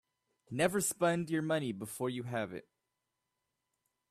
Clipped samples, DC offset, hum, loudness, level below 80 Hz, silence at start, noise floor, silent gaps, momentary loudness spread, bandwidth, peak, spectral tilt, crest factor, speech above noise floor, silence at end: under 0.1%; under 0.1%; none; -35 LUFS; -74 dBFS; 0.5 s; -86 dBFS; none; 11 LU; 15.5 kHz; -18 dBFS; -4.5 dB/octave; 20 dB; 52 dB; 1.5 s